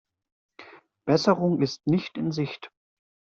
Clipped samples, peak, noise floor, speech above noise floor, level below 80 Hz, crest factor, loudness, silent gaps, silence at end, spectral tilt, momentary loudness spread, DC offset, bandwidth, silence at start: under 0.1%; -6 dBFS; -50 dBFS; 26 dB; -66 dBFS; 22 dB; -25 LUFS; none; 0.6 s; -6.5 dB/octave; 15 LU; under 0.1%; 7.8 kHz; 0.6 s